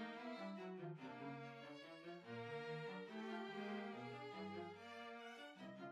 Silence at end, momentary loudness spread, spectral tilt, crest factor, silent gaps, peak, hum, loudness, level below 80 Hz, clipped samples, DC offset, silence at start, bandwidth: 0 s; 7 LU; -6 dB/octave; 14 dB; none; -38 dBFS; none; -52 LUFS; under -90 dBFS; under 0.1%; under 0.1%; 0 s; 12.5 kHz